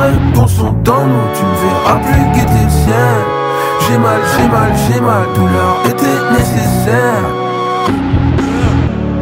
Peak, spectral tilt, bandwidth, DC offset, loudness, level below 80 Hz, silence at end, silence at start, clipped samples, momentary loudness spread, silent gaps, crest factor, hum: 0 dBFS; -6.5 dB/octave; 16.5 kHz; under 0.1%; -11 LUFS; -24 dBFS; 0 s; 0 s; under 0.1%; 3 LU; none; 10 dB; none